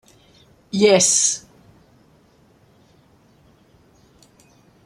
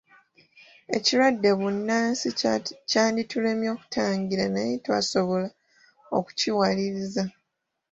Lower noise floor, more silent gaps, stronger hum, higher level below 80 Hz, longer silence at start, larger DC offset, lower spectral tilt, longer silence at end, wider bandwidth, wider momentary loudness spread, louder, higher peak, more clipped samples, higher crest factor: second, -55 dBFS vs -81 dBFS; neither; neither; about the same, -64 dBFS vs -64 dBFS; second, 0.75 s vs 0.9 s; neither; second, -2.5 dB/octave vs -4 dB/octave; first, 3.5 s vs 0.6 s; first, 13.5 kHz vs 8 kHz; first, 15 LU vs 8 LU; first, -16 LUFS vs -25 LUFS; first, -2 dBFS vs -8 dBFS; neither; about the same, 22 dB vs 18 dB